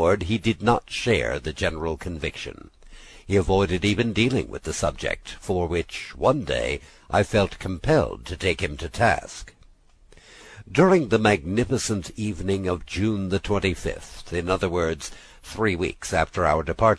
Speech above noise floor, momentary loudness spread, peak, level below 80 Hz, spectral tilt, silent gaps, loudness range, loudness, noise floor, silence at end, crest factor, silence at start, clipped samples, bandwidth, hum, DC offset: 30 dB; 10 LU; -4 dBFS; -40 dBFS; -5.5 dB/octave; none; 3 LU; -24 LUFS; -53 dBFS; 0 s; 20 dB; 0 s; under 0.1%; 11 kHz; none; under 0.1%